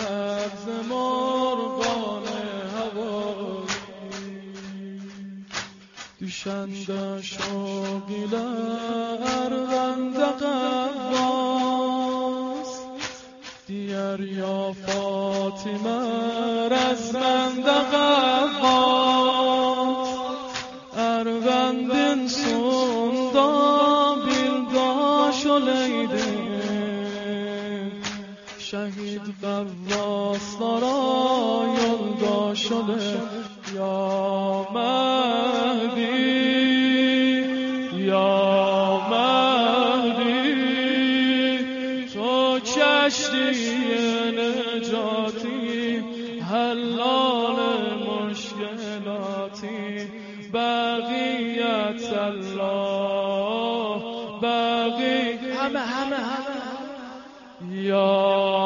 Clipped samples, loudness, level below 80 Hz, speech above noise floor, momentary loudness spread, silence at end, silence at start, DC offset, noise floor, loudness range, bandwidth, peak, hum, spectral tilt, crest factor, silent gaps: under 0.1%; -23 LUFS; -62 dBFS; 21 dB; 13 LU; 0 s; 0 s; under 0.1%; -44 dBFS; 9 LU; 7.4 kHz; -6 dBFS; none; -4 dB/octave; 18 dB; none